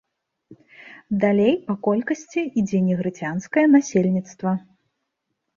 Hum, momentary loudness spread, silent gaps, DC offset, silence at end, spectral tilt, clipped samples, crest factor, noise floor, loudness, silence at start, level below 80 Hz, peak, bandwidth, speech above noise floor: none; 10 LU; none; under 0.1%; 1 s; -7 dB/octave; under 0.1%; 18 dB; -78 dBFS; -21 LUFS; 0.5 s; -62 dBFS; -4 dBFS; 7.4 kHz; 57 dB